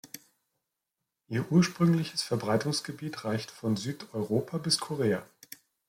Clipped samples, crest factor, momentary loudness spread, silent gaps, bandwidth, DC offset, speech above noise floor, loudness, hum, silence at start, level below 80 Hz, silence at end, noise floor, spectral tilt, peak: under 0.1%; 20 dB; 16 LU; none; 16.5 kHz; under 0.1%; 57 dB; -30 LUFS; none; 0.05 s; -70 dBFS; 0.65 s; -86 dBFS; -5.5 dB/octave; -12 dBFS